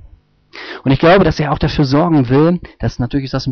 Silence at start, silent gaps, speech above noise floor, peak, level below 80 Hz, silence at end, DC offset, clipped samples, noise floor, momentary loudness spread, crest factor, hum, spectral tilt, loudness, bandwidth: 0.55 s; none; 32 dB; -2 dBFS; -32 dBFS; 0 s; under 0.1%; under 0.1%; -45 dBFS; 12 LU; 12 dB; none; -6 dB/octave; -14 LUFS; 6.6 kHz